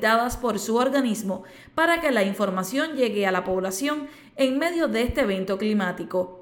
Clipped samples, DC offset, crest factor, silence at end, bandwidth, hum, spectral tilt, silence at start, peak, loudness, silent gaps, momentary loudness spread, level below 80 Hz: under 0.1%; under 0.1%; 16 dB; 0 s; 19 kHz; none; -4.5 dB/octave; 0 s; -8 dBFS; -24 LUFS; none; 7 LU; -46 dBFS